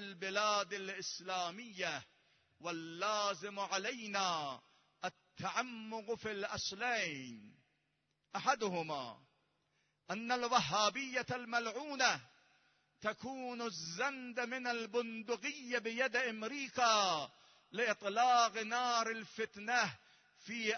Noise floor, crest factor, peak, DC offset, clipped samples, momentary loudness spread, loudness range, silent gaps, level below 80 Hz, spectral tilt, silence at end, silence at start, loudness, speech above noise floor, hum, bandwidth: -82 dBFS; 24 dB; -16 dBFS; under 0.1%; under 0.1%; 13 LU; 6 LU; none; -80 dBFS; -1 dB/octave; 0 s; 0 s; -37 LUFS; 45 dB; none; 6.4 kHz